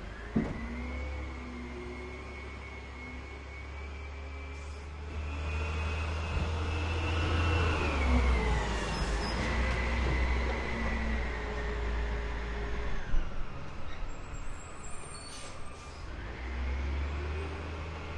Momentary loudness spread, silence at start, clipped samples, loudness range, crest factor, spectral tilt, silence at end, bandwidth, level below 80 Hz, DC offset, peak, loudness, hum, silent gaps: 14 LU; 0 s; under 0.1%; 12 LU; 16 dB; -5.5 dB/octave; 0 s; 11 kHz; -36 dBFS; under 0.1%; -16 dBFS; -35 LUFS; none; none